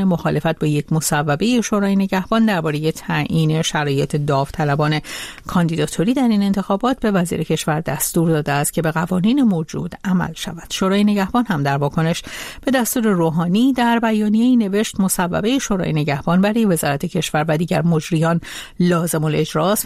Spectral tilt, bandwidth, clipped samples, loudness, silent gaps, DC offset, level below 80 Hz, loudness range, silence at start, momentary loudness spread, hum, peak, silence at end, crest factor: -5.5 dB/octave; 15.5 kHz; under 0.1%; -18 LUFS; none; under 0.1%; -44 dBFS; 2 LU; 0 s; 5 LU; none; -4 dBFS; 0 s; 14 dB